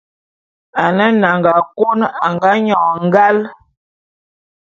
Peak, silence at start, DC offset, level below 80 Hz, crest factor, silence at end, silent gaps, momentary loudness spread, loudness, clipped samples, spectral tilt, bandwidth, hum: 0 dBFS; 0.75 s; under 0.1%; -60 dBFS; 14 dB; 1.15 s; none; 6 LU; -13 LUFS; under 0.1%; -7.5 dB/octave; 7.2 kHz; none